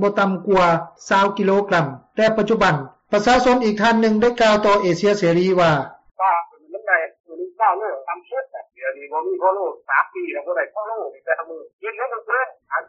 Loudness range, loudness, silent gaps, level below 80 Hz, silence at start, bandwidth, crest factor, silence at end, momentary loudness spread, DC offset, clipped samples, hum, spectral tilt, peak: 7 LU; -19 LUFS; 7.20-7.24 s, 11.73-11.79 s; -50 dBFS; 0 s; 8 kHz; 16 dB; 0.05 s; 13 LU; under 0.1%; under 0.1%; none; -4 dB/octave; -4 dBFS